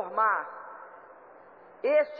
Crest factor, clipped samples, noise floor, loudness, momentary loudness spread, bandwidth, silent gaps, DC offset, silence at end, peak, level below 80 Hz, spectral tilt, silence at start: 16 dB; under 0.1%; -52 dBFS; -28 LUFS; 24 LU; 4.9 kHz; none; under 0.1%; 0 s; -14 dBFS; -84 dBFS; -6 dB/octave; 0 s